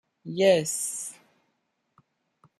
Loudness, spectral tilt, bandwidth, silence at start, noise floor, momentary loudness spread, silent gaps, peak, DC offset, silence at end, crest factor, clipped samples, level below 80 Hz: -25 LUFS; -3.5 dB/octave; 14 kHz; 0.25 s; -76 dBFS; 16 LU; none; -8 dBFS; under 0.1%; 1.45 s; 20 dB; under 0.1%; -76 dBFS